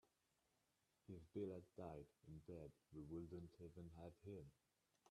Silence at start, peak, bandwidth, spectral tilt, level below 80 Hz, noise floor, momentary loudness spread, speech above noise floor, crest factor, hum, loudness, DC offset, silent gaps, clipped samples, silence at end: 0.05 s; -40 dBFS; 12 kHz; -8.5 dB/octave; -78 dBFS; -87 dBFS; 10 LU; 30 dB; 18 dB; none; -58 LUFS; under 0.1%; none; under 0.1%; 0 s